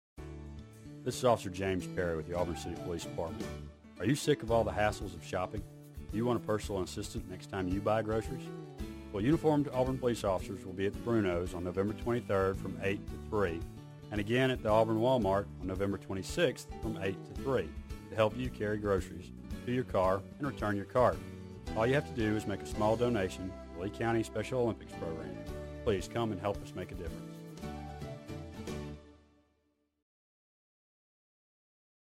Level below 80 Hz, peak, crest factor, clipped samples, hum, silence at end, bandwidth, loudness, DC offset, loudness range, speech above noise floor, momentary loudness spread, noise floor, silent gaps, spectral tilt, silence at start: -50 dBFS; -14 dBFS; 20 dB; under 0.1%; none; 2.9 s; 16 kHz; -34 LUFS; under 0.1%; 7 LU; 44 dB; 15 LU; -77 dBFS; none; -6 dB/octave; 0.15 s